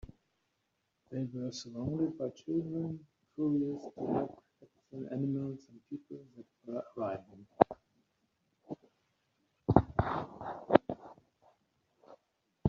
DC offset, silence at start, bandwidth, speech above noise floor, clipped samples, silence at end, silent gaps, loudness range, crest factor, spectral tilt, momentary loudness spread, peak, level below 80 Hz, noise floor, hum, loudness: under 0.1%; 1.1 s; 7.4 kHz; 45 dB; under 0.1%; 0 s; none; 6 LU; 34 dB; -7.5 dB/octave; 20 LU; -4 dBFS; -58 dBFS; -81 dBFS; none; -35 LUFS